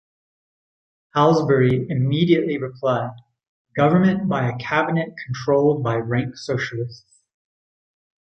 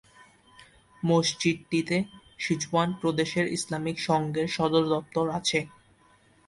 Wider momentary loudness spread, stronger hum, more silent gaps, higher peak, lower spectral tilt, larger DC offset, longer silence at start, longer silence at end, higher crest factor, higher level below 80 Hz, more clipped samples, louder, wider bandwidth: first, 10 LU vs 6 LU; neither; first, 3.49-3.65 s vs none; first, -2 dBFS vs -10 dBFS; first, -7.5 dB/octave vs -4.5 dB/octave; neither; first, 1.15 s vs 0.2 s; first, 1.3 s vs 0.8 s; about the same, 20 dB vs 18 dB; first, -56 dBFS vs -62 dBFS; neither; first, -20 LUFS vs -27 LUFS; second, 8.4 kHz vs 11.5 kHz